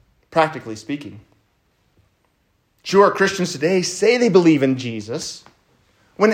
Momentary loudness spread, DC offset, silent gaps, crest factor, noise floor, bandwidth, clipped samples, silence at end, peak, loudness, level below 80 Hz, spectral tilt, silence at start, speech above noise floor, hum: 17 LU; under 0.1%; none; 20 dB; -65 dBFS; 15.5 kHz; under 0.1%; 0 s; 0 dBFS; -18 LUFS; -64 dBFS; -5 dB/octave; 0.3 s; 47 dB; none